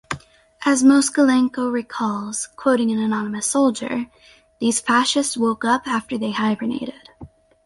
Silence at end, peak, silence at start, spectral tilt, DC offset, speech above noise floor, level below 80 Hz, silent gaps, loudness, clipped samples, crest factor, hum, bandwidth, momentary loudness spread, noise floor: 0.4 s; -4 dBFS; 0.1 s; -3.5 dB/octave; under 0.1%; 21 dB; -58 dBFS; none; -20 LUFS; under 0.1%; 16 dB; none; 11.5 kHz; 11 LU; -40 dBFS